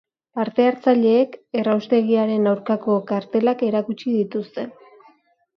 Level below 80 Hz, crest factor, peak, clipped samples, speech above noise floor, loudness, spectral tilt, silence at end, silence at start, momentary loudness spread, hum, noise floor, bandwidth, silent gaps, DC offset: -72 dBFS; 16 dB; -4 dBFS; under 0.1%; 37 dB; -20 LUFS; -8.5 dB/octave; 0.9 s; 0.35 s; 10 LU; none; -56 dBFS; 6.2 kHz; none; under 0.1%